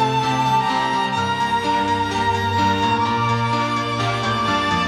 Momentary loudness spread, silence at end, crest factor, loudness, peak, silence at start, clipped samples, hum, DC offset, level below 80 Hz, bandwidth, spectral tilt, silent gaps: 2 LU; 0 s; 12 dB; -19 LUFS; -8 dBFS; 0 s; under 0.1%; none; under 0.1%; -46 dBFS; 14 kHz; -5 dB/octave; none